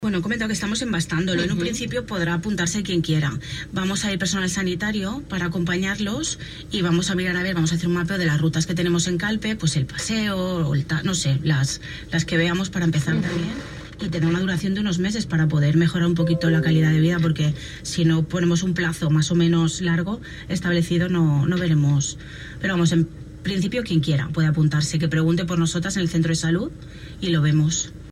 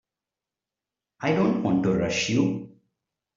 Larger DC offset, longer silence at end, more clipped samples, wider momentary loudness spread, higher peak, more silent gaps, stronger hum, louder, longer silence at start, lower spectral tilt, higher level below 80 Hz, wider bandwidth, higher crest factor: neither; second, 0 s vs 0.7 s; neither; about the same, 8 LU vs 6 LU; about the same, -8 dBFS vs -10 dBFS; neither; neither; about the same, -22 LUFS vs -24 LUFS; second, 0 s vs 1.2 s; about the same, -5.5 dB/octave vs -5.5 dB/octave; first, -44 dBFS vs -60 dBFS; first, 13 kHz vs 7.6 kHz; about the same, 14 dB vs 18 dB